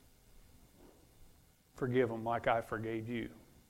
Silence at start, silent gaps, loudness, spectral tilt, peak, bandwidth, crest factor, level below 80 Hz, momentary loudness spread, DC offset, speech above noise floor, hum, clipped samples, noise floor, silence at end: 0.35 s; none; -37 LUFS; -7 dB/octave; -16 dBFS; 16 kHz; 24 dB; -62 dBFS; 9 LU; under 0.1%; 29 dB; none; under 0.1%; -65 dBFS; 0.3 s